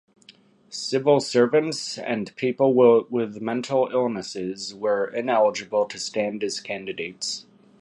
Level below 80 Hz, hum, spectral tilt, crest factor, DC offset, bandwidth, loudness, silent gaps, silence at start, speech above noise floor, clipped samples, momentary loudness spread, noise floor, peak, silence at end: -70 dBFS; none; -4.5 dB/octave; 18 dB; under 0.1%; 11.5 kHz; -23 LUFS; none; 0.7 s; 31 dB; under 0.1%; 12 LU; -54 dBFS; -6 dBFS; 0.4 s